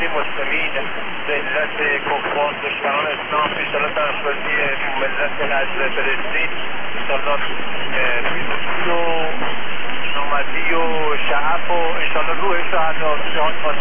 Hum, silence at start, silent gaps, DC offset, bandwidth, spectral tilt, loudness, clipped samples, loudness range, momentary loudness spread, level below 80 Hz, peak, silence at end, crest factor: none; 0 s; none; under 0.1%; 3.7 kHz; -7 dB/octave; -20 LUFS; under 0.1%; 2 LU; 4 LU; -56 dBFS; -4 dBFS; 0 s; 12 dB